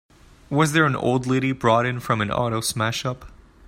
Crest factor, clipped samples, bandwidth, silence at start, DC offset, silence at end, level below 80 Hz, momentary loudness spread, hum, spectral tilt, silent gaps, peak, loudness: 18 dB; under 0.1%; 16 kHz; 0.5 s; under 0.1%; 0.35 s; -50 dBFS; 8 LU; none; -5 dB/octave; none; -4 dBFS; -22 LUFS